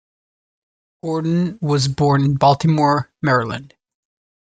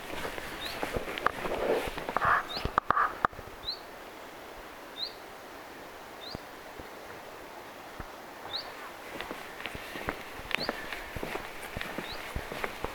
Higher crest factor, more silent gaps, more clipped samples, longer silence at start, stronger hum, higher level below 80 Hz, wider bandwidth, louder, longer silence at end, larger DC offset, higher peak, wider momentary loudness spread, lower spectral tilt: second, 18 dB vs 28 dB; neither; neither; first, 1.05 s vs 0 s; neither; about the same, -52 dBFS vs -50 dBFS; second, 9.2 kHz vs 19.5 kHz; first, -18 LUFS vs -35 LUFS; first, 0.75 s vs 0 s; neither; first, -2 dBFS vs -8 dBFS; second, 11 LU vs 16 LU; first, -6.5 dB/octave vs -3.5 dB/octave